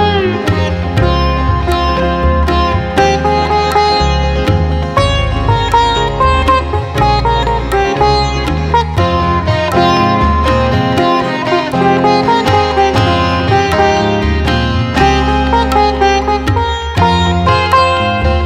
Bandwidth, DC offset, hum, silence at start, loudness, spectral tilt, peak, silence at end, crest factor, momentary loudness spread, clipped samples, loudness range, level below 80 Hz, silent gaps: 13.5 kHz; under 0.1%; none; 0 s; -12 LUFS; -6 dB/octave; 0 dBFS; 0 s; 10 dB; 3 LU; under 0.1%; 1 LU; -20 dBFS; none